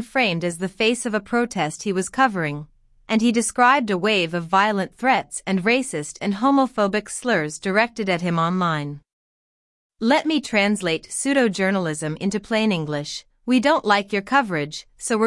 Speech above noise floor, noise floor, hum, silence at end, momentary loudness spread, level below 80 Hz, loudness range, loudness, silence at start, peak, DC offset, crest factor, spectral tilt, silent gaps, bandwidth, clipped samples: over 69 dB; under -90 dBFS; none; 0 s; 8 LU; -58 dBFS; 3 LU; -21 LUFS; 0 s; -4 dBFS; under 0.1%; 18 dB; -4.5 dB/octave; 9.13-9.90 s; 12 kHz; under 0.1%